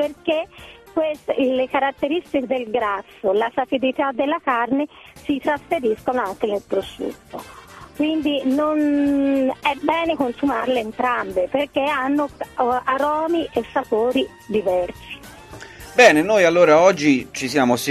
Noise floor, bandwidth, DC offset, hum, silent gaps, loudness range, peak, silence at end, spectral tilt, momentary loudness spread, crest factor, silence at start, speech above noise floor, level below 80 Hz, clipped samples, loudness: -39 dBFS; 14 kHz; under 0.1%; none; none; 6 LU; 0 dBFS; 0 s; -4.5 dB/octave; 15 LU; 20 dB; 0 s; 20 dB; -52 dBFS; under 0.1%; -20 LUFS